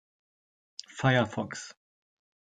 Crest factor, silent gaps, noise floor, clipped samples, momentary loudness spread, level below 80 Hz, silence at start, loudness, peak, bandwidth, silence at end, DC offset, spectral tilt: 24 dB; none; under -90 dBFS; under 0.1%; 21 LU; -68 dBFS; 0.9 s; -28 LUFS; -10 dBFS; 9.2 kHz; 0.75 s; under 0.1%; -5.5 dB/octave